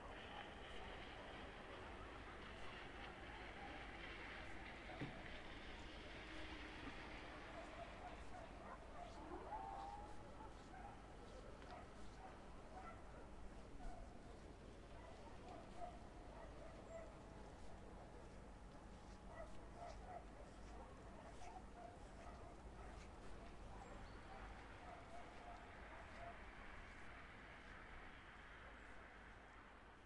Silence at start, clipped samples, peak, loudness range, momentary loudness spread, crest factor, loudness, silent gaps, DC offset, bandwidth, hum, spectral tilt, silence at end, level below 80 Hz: 0 s; under 0.1%; -38 dBFS; 5 LU; 6 LU; 18 dB; -57 LUFS; none; under 0.1%; 11 kHz; none; -5 dB/octave; 0 s; -62 dBFS